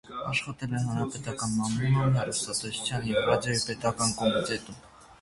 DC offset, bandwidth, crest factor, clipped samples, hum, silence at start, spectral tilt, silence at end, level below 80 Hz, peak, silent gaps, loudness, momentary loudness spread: under 0.1%; 11.5 kHz; 20 dB; under 0.1%; none; 0.05 s; -4.5 dB/octave; 0.05 s; -54 dBFS; -10 dBFS; none; -28 LUFS; 8 LU